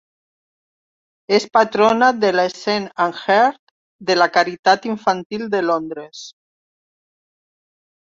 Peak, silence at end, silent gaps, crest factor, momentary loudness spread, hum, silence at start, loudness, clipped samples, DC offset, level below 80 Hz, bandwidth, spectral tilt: -2 dBFS; 1.8 s; 3.59-3.99 s, 4.59-4.63 s, 5.26-5.30 s; 18 dB; 14 LU; none; 1.3 s; -17 LUFS; under 0.1%; under 0.1%; -64 dBFS; 7.8 kHz; -4 dB/octave